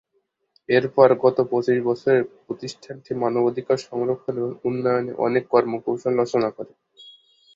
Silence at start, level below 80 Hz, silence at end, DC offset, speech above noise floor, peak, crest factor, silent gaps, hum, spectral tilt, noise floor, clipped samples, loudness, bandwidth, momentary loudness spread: 0.7 s; -66 dBFS; 0.45 s; under 0.1%; 50 dB; -2 dBFS; 20 dB; none; none; -7 dB/octave; -71 dBFS; under 0.1%; -22 LUFS; 7.6 kHz; 15 LU